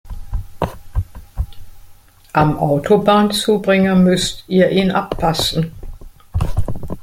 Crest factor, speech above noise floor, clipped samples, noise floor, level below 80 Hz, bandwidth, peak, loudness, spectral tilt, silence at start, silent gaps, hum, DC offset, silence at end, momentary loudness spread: 16 dB; 27 dB; under 0.1%; -42 dBFS; -30 dBFS; 16 kHz; 0 dBFS; -16 LUFS; -5.5 dB/octave; 0.05 s; none; none; under 0.1%; 0 s; 16 LU